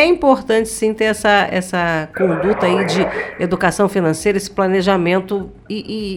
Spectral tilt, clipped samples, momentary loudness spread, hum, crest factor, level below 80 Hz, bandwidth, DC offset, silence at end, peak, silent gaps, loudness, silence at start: -5 dB/octave; under 0.1%; 8 LU; none; 16 dB; -44 dBFS; 16 kHz; under 0.1%; 0 s; 0 dBFS; none; -16 LUFS; 0 s